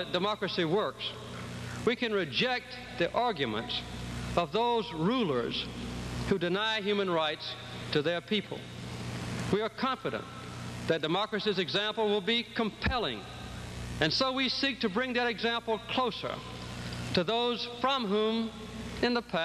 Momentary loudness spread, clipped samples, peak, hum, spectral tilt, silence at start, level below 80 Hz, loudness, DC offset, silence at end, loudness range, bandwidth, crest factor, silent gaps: 11 LU; under 0.1%; -10 dBFS; none; -5 dB/octave; 0 s; -52 dBFS; -31 LUFS; under 0.1%; 0 s; 2 LU; 13 kHz; 20 dB; none